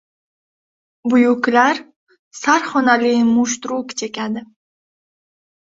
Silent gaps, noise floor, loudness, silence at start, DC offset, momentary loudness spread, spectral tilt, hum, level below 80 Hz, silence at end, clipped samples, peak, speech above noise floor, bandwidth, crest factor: 1.96-2.07 s, 2.19-2.31 s; under -90 dBFS; -17 LUFS; 1.05 s; under 0.1%; 11 LU; -3.5 dB/octave; none; -64 dBFS; 1.3 s; under 0.1%; -2 dBFS; over 74 dB; 7.8 kHz; 18 dB